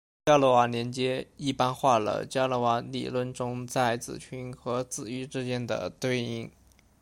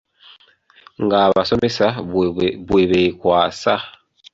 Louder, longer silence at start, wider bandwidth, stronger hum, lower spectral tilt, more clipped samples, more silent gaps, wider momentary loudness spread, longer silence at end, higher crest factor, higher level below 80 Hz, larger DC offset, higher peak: second, -28 LUFS vs -17 LUFS; second, 0.25 s vs 1 s; first, 16.5 kHz vs 7.8 kHz; neither; about the same, -5 dB/octave vs -6 dB/octave; neither; neither; first, 12 LU vs 7 LU; about the same, 0.55 s vs 0.45 s; about the same, 20 dB vs 16 dB; second, -62 dBFS vs -46 dBFS; neither; second, -10 dBFS vs -2 dBFS